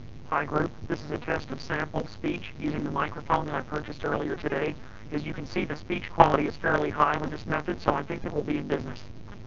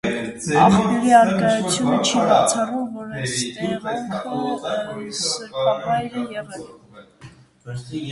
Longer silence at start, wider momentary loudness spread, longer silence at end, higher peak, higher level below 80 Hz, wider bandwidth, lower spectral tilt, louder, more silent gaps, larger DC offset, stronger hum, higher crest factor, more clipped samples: about the same, 0 s vs 0.05 s; second, 9 LU vs 15 LU; about the same, 0 s vs 0 s; about the same, 0 dBFS vs 0 dBFS; about the same, -48 dBFS vs -52 dBFS; second, 7.4 kHz vs 11.5 kHz; first, -7 dB/octave vs -4.5 dB/octave; second, -29 LUFS vs -20 LUFS; neither; first, 0.8% vs under 0.1%; neither; first, 28 dB vs 20 dB; neither